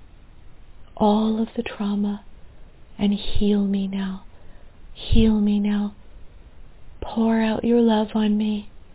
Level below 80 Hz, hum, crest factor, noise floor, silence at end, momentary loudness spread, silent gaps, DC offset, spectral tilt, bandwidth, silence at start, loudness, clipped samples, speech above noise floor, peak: -34 dBFS; none; 20 dB; -43 dBFS; 0.15 s; 12 LU; none; under 0.1%; -11 dB/octave; 4 kHz; 0 s; -22 LUFS; under 0.1%; 23 dB; -2 dBFS